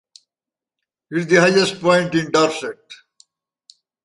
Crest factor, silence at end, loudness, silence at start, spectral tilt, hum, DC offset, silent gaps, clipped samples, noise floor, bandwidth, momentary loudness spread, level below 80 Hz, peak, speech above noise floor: 18 dB; 1.1 s; -17 LUFS; 1.1 s; -4.5 dB/octave; none; under 0.1%; none; under 0.1%; -89 dBFS; 11.5 kHz; 15 LU; -62 dBFS; -2 dBFS; 72 dB